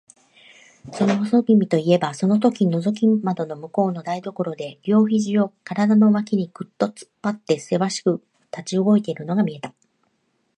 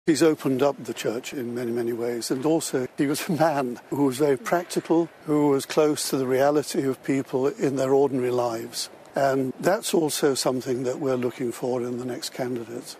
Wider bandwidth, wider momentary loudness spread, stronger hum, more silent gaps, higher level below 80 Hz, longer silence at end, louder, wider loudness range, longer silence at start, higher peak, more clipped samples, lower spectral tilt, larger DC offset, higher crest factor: second, 9.8 kHz vs 14.5 kHz; first, 11 LU vs 8 LU; neither; neither; about the same, -70 dBFS vs -68 dBFS; first, 0.9 s vs 0 s; first, -21 LUFS vs -25 LUFS; about the same, 3 LU vs 2 LU; first, 0.85 s vs 0.05 s; first, -4 dBFS vs -8 dBFS; neither; first, -7 dB/octave vs -5 dB/octave; neither; about the same, 18 dB vs 16 dB